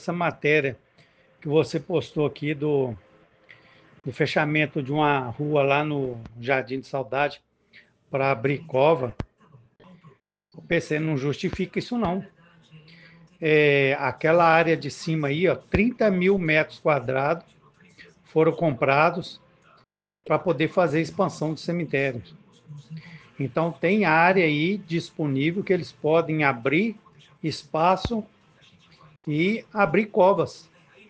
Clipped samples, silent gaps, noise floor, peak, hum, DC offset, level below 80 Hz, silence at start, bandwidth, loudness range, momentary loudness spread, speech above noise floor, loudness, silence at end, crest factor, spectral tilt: under 0.1%; none; -64 dBFS; -4 dBFS; none; under 0.1%; -54 dBFS; 0 s; 9 kHz; 6 LU; 12 LU; 40 dB; -23 LUFS; 0.5 s; 22 dB; -7 dB/octave